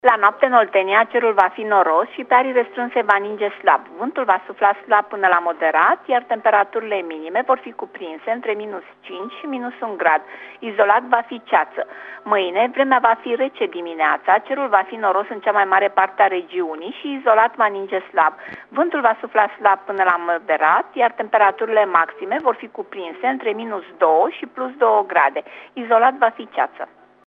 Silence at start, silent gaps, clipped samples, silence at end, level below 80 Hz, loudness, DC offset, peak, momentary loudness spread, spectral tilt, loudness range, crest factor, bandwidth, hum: 0.05 s; none; under 0.1%; 0.4 s; -76 dBFS; -18 LUFS; under 0.1%; 0 dBFS; 13 LU; -5.5 dB/octave; 4 LU; 18 dB; 5 kHz; none